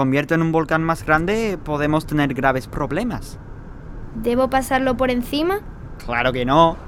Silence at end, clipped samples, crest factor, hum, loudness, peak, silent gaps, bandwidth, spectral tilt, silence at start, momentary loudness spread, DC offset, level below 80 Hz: 0 s; under 0.1%; 20 dB; none; -20 LUFS; 0 dBFS; none; 17 kHz; -6 dB/octave; 0 s; 18 LU; under 0.1%; -36 dBFS